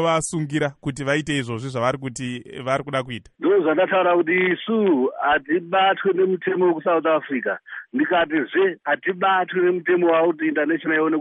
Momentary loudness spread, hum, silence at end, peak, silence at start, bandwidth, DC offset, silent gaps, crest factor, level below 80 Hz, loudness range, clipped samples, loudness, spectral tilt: 9 LU; none; 0 s; -8 dBFS; 0 s; 11 kHz; under 0.1%; none; 14 dB; -58 dBFS; 4 LU; under 0.1%; -21 LUFS; -5.5 dB/octave